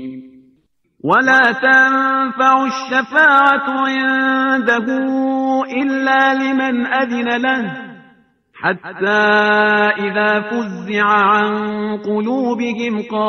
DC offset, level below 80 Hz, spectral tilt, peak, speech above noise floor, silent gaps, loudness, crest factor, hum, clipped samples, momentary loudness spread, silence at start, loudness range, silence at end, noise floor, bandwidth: under 0.1%; -64 dBFS; -5 dB/octave; 0 dBFS; 45 dB; none; -14 LUFS; 16 dB; none; under 0.1%; 10 LU; 0 s; 5 LU; 0 s; -60 dBFS; 6.6 kHz